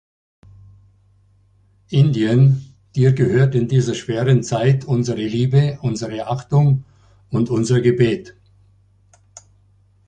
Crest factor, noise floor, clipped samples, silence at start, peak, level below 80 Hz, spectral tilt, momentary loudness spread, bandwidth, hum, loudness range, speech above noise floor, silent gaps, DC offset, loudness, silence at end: 16 dB; -56 dBFS; under 0.1%; 1.9 s; -2 dBFS; -50 dBFS; -7.5 dB/octave; 9 LU; 9 kHz; none; 3 LU; 39 dB; none; under 0.1%; -18 LUFS; 1.75 s